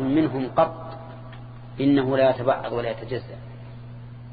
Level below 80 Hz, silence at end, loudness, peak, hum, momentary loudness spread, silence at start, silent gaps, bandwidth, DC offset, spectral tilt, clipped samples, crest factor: -50 dBFS; 0 s; -23 LUFS; -6 dBFS; none; 20 LU; 0 s; none; 5 kHz; under 0.1%; -11 dB/octave; under 0.1%; 18 dB